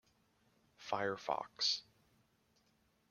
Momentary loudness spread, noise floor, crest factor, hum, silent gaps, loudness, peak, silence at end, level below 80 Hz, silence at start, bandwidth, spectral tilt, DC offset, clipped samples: 7 LU; -76 dBFS; 22 dB; none; none; -38 LUFS; -22 dBFS; 1.3 s; -82 dBFS; 0.8 s; 15.5 kHz; -2 dB/octave; under 0.1%; under 0.1%